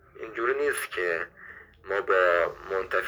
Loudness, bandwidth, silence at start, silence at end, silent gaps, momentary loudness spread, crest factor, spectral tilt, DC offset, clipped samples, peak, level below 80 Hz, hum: -27 LUFS; over 20 kHz; 0.15 s; 0 s; none; 19 LU; 18 dB; -3 dB/octave; under 0.1%; under 0.1%; -10 dBFS; -60 dBFS; none